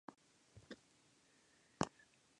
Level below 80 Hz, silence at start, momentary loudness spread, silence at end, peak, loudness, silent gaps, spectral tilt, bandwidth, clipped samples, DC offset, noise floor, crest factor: -74 dBFS; 0.1 s; 22 LU; 0.5 s; -20 dBFS; -47 LUFS; none; -4.5 dB/octave; 10.5 kHz; under 0.1%; under 0.1%; -73 dBFS; 32 dB